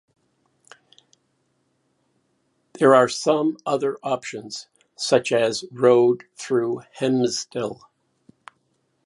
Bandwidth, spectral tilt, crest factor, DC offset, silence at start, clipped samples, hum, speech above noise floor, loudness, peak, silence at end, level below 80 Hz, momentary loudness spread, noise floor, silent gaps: 11.5 kHz; -4.5 dB/octave; 22 dB; under 0.1%; 2.75 s; under 0.1%; none; 49 dB; -21 LUFS; -2 dBFS; 1.3 s; -72 dBFS; 15 LU; -69 dBFS; none